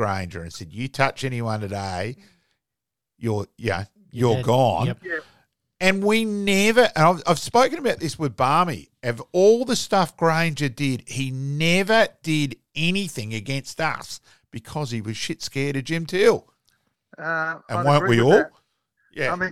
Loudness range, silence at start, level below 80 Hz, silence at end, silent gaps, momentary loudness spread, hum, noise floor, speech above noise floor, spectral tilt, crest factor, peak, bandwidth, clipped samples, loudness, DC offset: 8 LU; 0 s; -54 dBFS; 0 s; none; 14 LU; none; -86 dBFS; 64 dB; -5 dB/octave; 20 dB; -2 dBFS; 15.5 kHz; under 0.1%; -22 LUFS; 0.5%